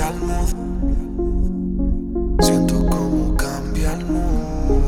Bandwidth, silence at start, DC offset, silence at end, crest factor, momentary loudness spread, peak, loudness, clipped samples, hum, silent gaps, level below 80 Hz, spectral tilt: 16.5 kHz; 0 s; under 0.1%; 0 s; 16 dB; 7 LU; -2 dBFS; -21 LUFS; under 0.1%; none; none; -22 dBFS; -6 dB/octave